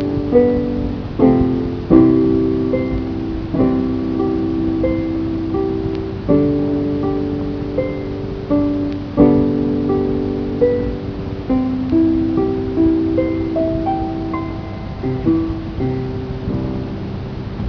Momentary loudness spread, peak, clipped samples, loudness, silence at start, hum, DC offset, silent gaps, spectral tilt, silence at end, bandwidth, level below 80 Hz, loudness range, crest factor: 10 LU; 0 dBFS; under 0.1%; -18 LUFS; 0 s; none; under 0.1%; none; -10 dB/octave; 0 s; 5.4 kHz; -32 dBFS; 4 LU; 18 dB